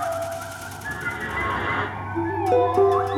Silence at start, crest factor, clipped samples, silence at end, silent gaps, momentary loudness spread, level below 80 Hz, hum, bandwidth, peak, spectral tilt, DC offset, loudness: 0 s; 16 dB; under 0.1%; 0 s; none; 13 LU; -46 dBFS; none; 17.5 kHz; -8 dBFS; -5.5 dB/octave; under 0.1%; -24 LUFS